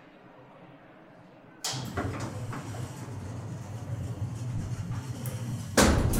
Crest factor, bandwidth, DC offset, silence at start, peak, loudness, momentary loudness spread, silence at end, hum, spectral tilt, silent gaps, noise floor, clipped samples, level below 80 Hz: 26 dB; 16 kHz; under 0.1%; 0 s; -6 dBFS; -32 LUFS; 25 LU; 0 s; none; -4.5 dB/octave; none; -52 dBFS; under 0.1%; -42 dBFS